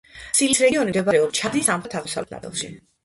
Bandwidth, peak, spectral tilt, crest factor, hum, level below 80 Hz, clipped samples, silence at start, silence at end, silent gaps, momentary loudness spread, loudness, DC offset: 12 kHz; -4 dBFS; -3 dB/octave; 18 dB; none; -56 dBFS; under 0.1%; 0.15 s; 0.25 s; none; 13 LU; -21 LUFS; under 0.1%